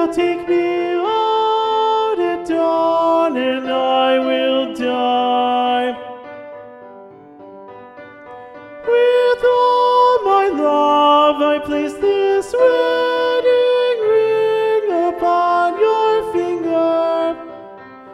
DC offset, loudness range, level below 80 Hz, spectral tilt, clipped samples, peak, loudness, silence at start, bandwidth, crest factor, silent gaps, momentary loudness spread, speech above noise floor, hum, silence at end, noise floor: under 0.1%; 7 LU; -56 dBFS; -4.5 dB/octave; under 0.1%; -2 dBFS; -16 LUFS; 0 s; 12 kHz; 14 dB; none; 14 LU; 22 dB; none; 0 s; -39 dBFS